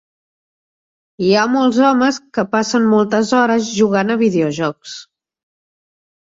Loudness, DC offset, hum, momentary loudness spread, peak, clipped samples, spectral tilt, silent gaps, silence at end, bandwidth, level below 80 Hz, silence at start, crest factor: -15 LUFS; under 0.1%; none; 9 LU; -2 dBFS; under 0.1%; -5 dB/octave; none; 1.2 s; 7.8 kHz; -60 dBFS; 1.2 s; 14 dB